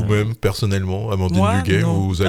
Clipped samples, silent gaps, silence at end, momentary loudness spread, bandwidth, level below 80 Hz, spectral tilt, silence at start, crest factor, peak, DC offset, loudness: under 0.1%; none; 0 s; 4 LU; 15 kHz; -38 dBFS; -6.5 dB/octave; 0 s; 14 dB; -4 dBFS; under 0.1%; -19 LUFS